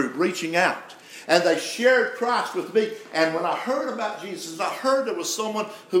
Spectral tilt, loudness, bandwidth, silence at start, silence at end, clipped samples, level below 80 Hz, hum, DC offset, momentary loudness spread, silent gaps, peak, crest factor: -3 dB/octave; -24 LUFS; 16 kHz; 0 s; 0 s; under 0.1%; -86 dBFS; none; under 0.1%; 10 LU; none; -2 dBFS; 22 dB